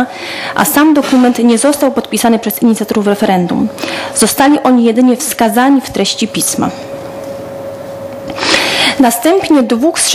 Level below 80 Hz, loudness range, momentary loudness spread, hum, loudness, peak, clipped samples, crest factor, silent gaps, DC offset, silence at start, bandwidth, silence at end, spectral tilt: -48 dBFS; 4 LU; 15 LU; none; -10 LUFS; 0 dBFS; under 0.1%; 10 dB; none; under 0.1%; 0 s; 16 kHz; 0 s; -3.5 dB/octave